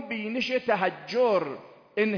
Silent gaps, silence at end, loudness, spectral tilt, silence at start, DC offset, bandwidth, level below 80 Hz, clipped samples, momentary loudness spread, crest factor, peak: none; 0 s; -27 LUFS; -5.5 dB/octave; 0 s; under 0.1%; 5.4 kHz; -72 dBFS; under 0.1%; 11 LU; 16 dB; -12 dBFS